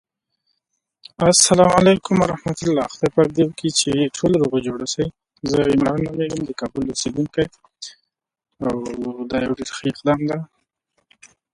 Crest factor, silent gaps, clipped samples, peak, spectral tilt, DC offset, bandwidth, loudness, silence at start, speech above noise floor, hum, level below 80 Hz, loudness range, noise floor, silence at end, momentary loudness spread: 20 dB; none; under 0.1%; 0 dBFS; -4.5 dB/octave; under 0.1%; 11.5 kHz; -19 LUFS; 1.2 s; 57 dB; none; -48 dBFS; 9 LU; -76 dBFS; 1.1 s; 14 LU